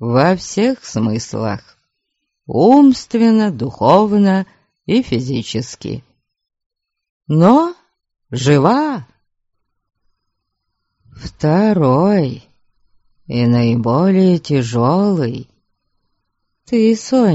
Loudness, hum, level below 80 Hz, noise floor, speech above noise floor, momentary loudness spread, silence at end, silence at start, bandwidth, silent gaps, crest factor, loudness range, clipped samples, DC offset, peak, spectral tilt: -14 LUFS; none; -50 dBFS; -74 dBFS; 61 dB; 16 LU; 0 s; 0 s; 8 kHz; 6.66-6.70 s, 7.09-7.20 s; 16 dB; 6 LU; under 0.1%; under 0.1%; 0 dBFS; -7 dB/octave